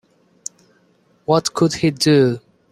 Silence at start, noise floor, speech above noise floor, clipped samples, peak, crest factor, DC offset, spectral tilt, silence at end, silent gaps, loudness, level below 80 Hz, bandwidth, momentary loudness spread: 1.3 s; -58 dBFS; 42 dB; under 0.1%; -2 dBFS; 18 dB; under 0.1%; -5 dB/octave; 0.35 s; none; -17 LUFS; -56 dBFS; 14.5 kHz; 19 LU